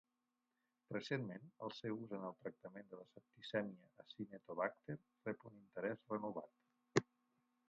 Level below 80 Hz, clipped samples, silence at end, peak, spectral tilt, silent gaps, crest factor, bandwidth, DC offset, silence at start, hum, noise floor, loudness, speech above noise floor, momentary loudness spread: -86 dBFS; under 0.1%; 0.65 s; -18 dBFS; -5 dB/octave; none; 30 dB; 7.2 kHz; under 0.1%; 0.9 s; none; -89 dBFS; -47 LUFS; 42 dB; 16 LU